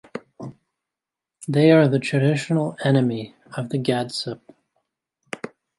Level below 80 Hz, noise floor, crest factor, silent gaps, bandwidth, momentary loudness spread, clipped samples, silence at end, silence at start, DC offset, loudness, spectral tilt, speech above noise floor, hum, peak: -66 dBFS; -87 dBFS; 20 dB; none; 11.5 kHz; 22 LU; under 0.1%; 0.3 s; 0.15 s; under 0.1%; -20 LUFS; -7 dB/octave; 67 dB; none; -4 dBFS